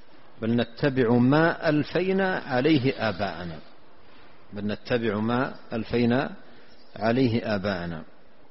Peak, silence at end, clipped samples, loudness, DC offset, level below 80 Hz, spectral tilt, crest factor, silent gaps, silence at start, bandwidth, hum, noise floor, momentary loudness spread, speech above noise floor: -8 dBFS; 0.5 s; under 0.1%; -25 LUFS; 0.8%; -54 dBFS; -5.5 dB/octave; 18 dB; none; 0.4 s; 6 kHz; none; -54 dBFS; 13 LU; 30 dB